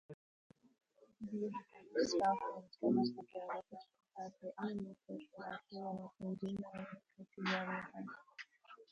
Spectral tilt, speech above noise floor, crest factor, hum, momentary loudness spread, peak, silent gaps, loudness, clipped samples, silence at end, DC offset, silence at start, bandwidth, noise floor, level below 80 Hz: -5.5 dB/octave; 19 dB; 20 dB; none; 20 LU; -24 dBFS; 0.14-0.50 s; -42 LUFS; under 0.1%; 0.05 s; under 0.1%; 0.1 s; 9.6 kHz; -61 dBFS; -80 dBFS